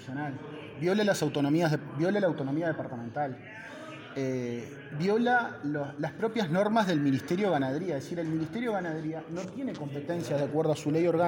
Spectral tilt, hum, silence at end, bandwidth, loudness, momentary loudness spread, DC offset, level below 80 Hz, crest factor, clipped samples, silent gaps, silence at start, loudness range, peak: -6.5 dB/octave; none; 0 s; 17 kHz; -30 LUFS; 11 LU; under 0.1%; -70 dBFS; 16 dB; under 0.1%; none; 0 s; 4 LU; -14 dBFS